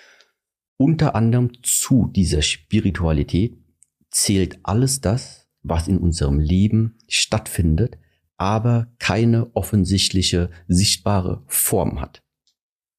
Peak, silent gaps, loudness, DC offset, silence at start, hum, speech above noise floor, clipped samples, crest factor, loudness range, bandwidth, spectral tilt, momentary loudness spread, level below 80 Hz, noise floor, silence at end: -6 dBFS; none; -19 LUFS; under 0.1%; 0.8 s; none; 42 dB; under 0.1%; 14 dB; 2 LU; 15.5 kHz; -4.5 dB/octave; 6 LU; -34 dBFS; -60 dBFS; 0.9 s